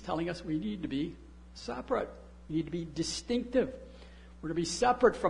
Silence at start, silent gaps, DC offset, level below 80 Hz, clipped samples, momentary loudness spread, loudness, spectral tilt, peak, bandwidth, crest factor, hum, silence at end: 0 s; none; under 0.1%; -52 dBFS; under 0.1%; 22 LU; -33 LUFS; -5 dB/octave; -10 dBFS; 11 kHz; 22 dB; none; 0 s